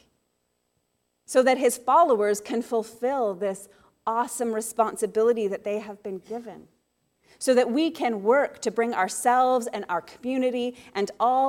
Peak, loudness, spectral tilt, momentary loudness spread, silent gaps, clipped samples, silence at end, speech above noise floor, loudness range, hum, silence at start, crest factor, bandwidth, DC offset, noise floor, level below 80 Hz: -8 dBFS; -25 LUFS; -3.5 dB/octave; 11 LU; none; under 0.1%; 0 s; 50 dB; 4 LU; none; 1.3 s; 18 dB; 16.5 kHz; under 0.1%; -74 dBFS; -72 dBFS